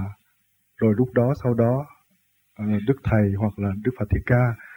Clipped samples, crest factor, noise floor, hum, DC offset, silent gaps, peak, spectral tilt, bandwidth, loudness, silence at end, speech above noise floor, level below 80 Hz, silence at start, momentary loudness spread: under 0.1%; 16 dB; -67 dBFS; none; under 0.1%; none; -6 dBFS; -10.5 dB/octave; 16.5 kHz; -23 LUFS; 0 s; 46 dB; -40 dBFS; 0 s; 7 LU